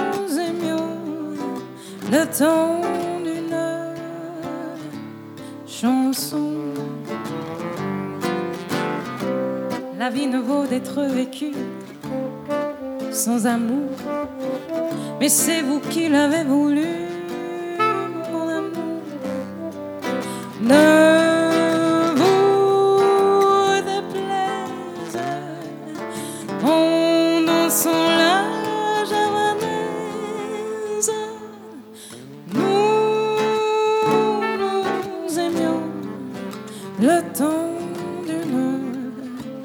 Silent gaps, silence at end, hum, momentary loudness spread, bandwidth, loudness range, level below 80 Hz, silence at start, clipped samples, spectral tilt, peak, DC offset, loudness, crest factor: none; 0 s; none; 15 LU; 18.5 kHz; 8 LU; -68 dBFS; 0 s; under 0.1%; -4 dB/octave; 0 dBFS; under 0.1%; -21 LUFS; 20 dB